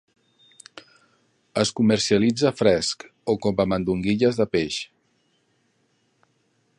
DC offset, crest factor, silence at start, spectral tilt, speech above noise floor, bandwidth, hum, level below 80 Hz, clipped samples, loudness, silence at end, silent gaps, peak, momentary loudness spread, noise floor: under 0.1%; 20 dB; 1.55 s; -5 dB/octave; 46 dB; 11 kHz; none; -52 dBFS; under 0.1%; -22 LUFS; 1.95 s; none; -4 dBFS; 13 LU; -67 dBFS